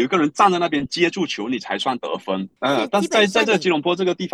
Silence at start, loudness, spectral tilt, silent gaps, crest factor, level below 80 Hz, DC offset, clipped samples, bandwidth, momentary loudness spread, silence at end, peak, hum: 0 s; -20 LUFS; -4.5 dB/octave; none; 18 dB; -62 dBFS; under 0.1%; under 0.1%; 13 kHz; 9 LU; 0.05 s; -2 dBFS; none